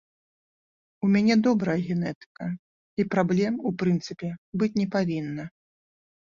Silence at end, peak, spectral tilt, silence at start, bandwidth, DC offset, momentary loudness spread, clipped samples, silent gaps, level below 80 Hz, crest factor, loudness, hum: 0.75 s; -8 dBFS; -7.5 dB/octave; 1 s; 7.4 kHz; under 0.1%; 14 LU; under 0.1%; 2.15-2.35 s, 2.59-2.97 s, 4.38-4.53 s; -64 dBFS; 18 dB; -26 LUFS; none